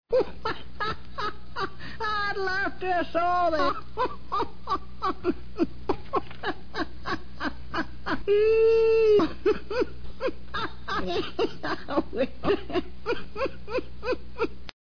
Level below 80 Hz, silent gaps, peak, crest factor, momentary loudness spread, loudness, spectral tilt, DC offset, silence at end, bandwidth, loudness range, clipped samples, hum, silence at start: -46 dBFS; none; -12 dBFS; 16 dB; 12 LU; -28 LUFS; -6 dB/octave; 2%; 0.1 s; 5.4 kHz; 7 LU; under 0.1%; none; 0 s